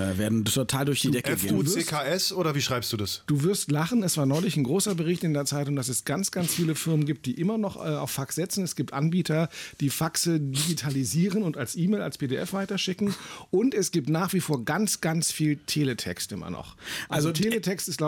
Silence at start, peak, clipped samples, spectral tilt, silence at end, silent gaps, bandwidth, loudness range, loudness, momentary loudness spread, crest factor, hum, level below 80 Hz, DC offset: 0 s; -14 dBFS; under 0.1%; -4.5 dB/octave; 0 s; none; 19 kHz; 2 LU; -27 LUFS; 5 LU; 12 dB; none; -60 dBFS; under 0.1%